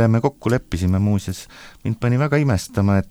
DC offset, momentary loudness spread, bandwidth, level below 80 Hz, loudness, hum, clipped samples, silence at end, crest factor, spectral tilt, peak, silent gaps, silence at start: under 0.1%; 12 LU; 15.5 kHz; -40 dBFS; -20 LUFS; none; under 0.1%; 0.05 s; 16 dB; -7 dB/octave; -2 dBFS; none; 0 s